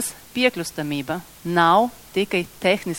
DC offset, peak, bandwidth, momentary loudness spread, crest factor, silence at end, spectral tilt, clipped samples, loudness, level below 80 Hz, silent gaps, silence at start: under 0.1%; -4 dBFS; 17 kHz; 11 LU; 18 dB; 0 s; -4 dB/octave; under 0.1%; -22 LUFS; -54 dBFS; none; 0 s